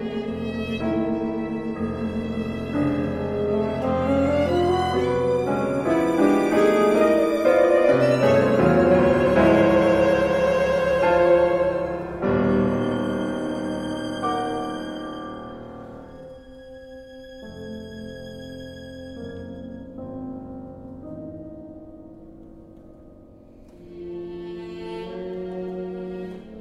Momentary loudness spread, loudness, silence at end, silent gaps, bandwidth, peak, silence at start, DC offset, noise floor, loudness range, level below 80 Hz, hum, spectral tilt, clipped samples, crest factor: 21 LU; -21 LUFS; 0 s; none; 15 kHz; -4 dBFS; 0 s; under 0.1%; -47 dBFS; 21 LU; -46 dBFS; none; -7 dB/octave; under 0.1%; 18 dB